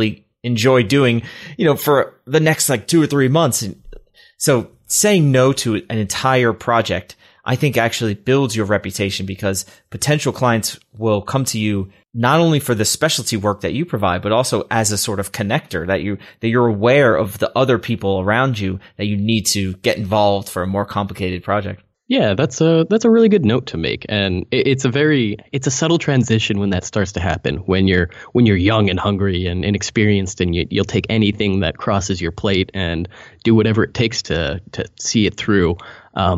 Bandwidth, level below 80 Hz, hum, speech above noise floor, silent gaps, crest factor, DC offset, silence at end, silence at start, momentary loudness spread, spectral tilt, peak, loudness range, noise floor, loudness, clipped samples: 15.5 kHz; -42 dBFS; none; 24 dB; none; 14 dB; under 0.1%; 0 s; 0 s; 9 LU; -5 dB/octave; -2 dBFS; 3 LU; -41 dBFS; -17 LUFS; under 0.1%